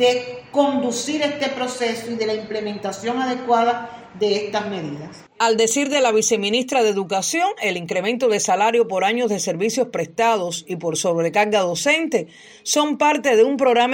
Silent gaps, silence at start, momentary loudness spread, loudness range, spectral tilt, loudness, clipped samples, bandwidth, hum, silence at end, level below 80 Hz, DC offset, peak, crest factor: none; 0 s; 9 LU; 4 LU; -3 dB/octave; -20 LUFS; under 0.1%; 16.5 kHz; none; 0 s; -68 dBFS; under 0.1%; -4 dBFS; 16 dB